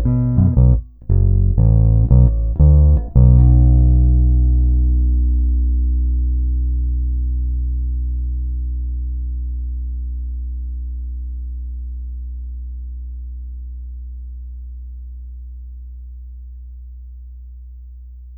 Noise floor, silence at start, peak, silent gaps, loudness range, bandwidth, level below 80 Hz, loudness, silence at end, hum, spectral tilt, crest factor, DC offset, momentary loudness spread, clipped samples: -35 dBFS; 0 s; -2 dBFS; none; 21 LU; 1.3 kHz; -18 dBFS; -17 LUFS; 0 s; none; -16 dB/octave; 14 dB; under 0.1%; 23 LU; under 0.1%